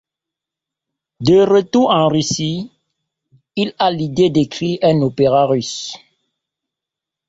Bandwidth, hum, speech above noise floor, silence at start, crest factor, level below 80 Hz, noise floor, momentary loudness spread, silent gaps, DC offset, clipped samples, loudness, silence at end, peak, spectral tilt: 8 kHz; none; 70 dB; 1.2 s; 16 dB; -52 dBFS; -85 dBFS; 14 LU; none; under 0.1%; under 0.1%; -15 LUFS; 1.35 s; -2 dBFS; -5.5 dB/octave